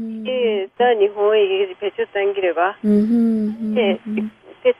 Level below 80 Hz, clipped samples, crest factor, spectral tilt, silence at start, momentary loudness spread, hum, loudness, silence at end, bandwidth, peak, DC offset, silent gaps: -62 dBFS; under 0.1%; 14 dB; -8 dB/octave; 0 s; 8 LU; none; -19 LUFS; 0.05 s; 5.2 kHz; -4 dBFS; under 0.1%; none